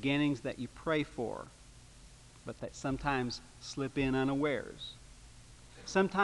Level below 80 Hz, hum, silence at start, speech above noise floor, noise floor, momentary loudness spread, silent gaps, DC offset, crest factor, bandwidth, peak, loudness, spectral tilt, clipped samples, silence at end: -56 dBFS; 60 Hz at -60 dBFS; 0 s; 22 dB; -56 dBFS; 25 LU; none; under 0.1%; 20 dB; 11.5 kHz; -16 dBFS; -35 LUFS; -5.5 dB/octave; under 0.1%; 0 s